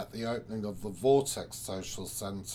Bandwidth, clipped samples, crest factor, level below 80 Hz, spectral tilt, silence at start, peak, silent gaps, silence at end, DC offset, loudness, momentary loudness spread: 19 kHz; under 0.1%; 20 dB; -58 dBFS; -4.5 dB/octave; 0 s; -14 dBFS; none; 0 s; under 0.1%; -33 LUFS; 11 LU